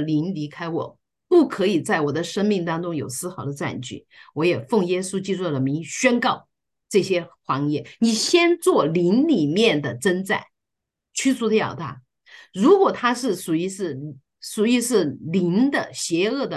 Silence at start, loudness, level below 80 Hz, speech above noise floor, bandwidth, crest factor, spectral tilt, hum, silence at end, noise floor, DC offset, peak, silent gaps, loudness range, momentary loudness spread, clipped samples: 0 s; -21 LUFS; -66 dBFS; 61 dB; 12.5 kHz; 18 dB; -5 dB/octave; none; 0 s; -83 dBFS; under 0.1%; -4 dBFS; none; 4 LU; 12 LU; under 0.1%